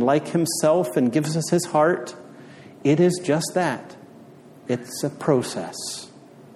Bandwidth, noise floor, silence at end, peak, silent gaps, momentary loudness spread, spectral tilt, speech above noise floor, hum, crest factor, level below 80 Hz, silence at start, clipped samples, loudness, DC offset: 15 kHz; -46 dBFS; 0.15 s; -6 dBFS; none; 15 LU; -5.5 dB/octave; 24 dB; none; 16 dB; -68 dBFS; 0 s; under 0.1%; -22 LUFS; under 0.1%